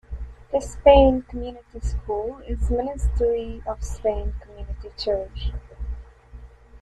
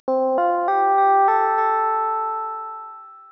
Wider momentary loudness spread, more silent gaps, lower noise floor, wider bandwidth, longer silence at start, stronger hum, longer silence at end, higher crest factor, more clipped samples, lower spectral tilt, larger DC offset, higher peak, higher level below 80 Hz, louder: first, 21 LU vs 15 LU; neither; first, -44 dBFS vs -39 dBFS; first, 11 kHz vs 5.4 kHz; about the same, 0.1 s vs 0.05 s; first, 60 Hz at -35 dBFS vs 50 Hz at -90 dBFS; about the same, 0.05 s vs 0.1 s; first, 22 dB vs 10 dB; neither; about the same, -6.5 dB/octave vs -5.5 dB/octave; neither; first, -2 dBFS vs -10 dBFS; first, -30 dBFS vs -80 dBFS; second, -23 LUFS vs -19 LUFS